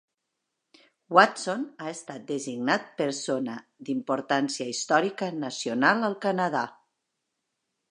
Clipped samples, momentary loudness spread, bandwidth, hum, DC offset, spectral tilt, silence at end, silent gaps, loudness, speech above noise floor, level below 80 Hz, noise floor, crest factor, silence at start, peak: under 0.1%; 13 LU; 11 kHz; none; under 0.1%; -4 dB/octave; 1.2 s; none; -27 LUFS; 56 dB; -82 dBFS; -82 dBFS; 26 dB; 1.1 s; -2 dBFS